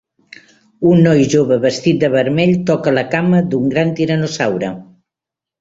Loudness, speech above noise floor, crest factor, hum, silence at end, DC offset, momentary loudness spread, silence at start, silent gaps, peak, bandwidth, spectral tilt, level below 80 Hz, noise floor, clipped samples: -14 LUFS; 72 dB; 14 dB; none; 0.75 s; under 0.1%; 7 LU; 0.8 s; none; -2 dBFS; 7.8 kHz; -6.5 dB/octave; -52 dBFS; -86 dBFS; under 0.1%